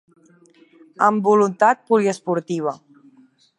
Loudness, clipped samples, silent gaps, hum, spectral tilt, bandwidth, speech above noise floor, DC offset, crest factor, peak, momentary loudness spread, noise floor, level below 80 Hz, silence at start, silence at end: -19 LUFS; under 0.1%; none; none; -6 dB/octave; 11 kHz; 36 dB; under 0.1%; 18 dB; -2 dBFS; 10 LU; -54 dBFS; -76 dBFS; 1 s; 0.8 s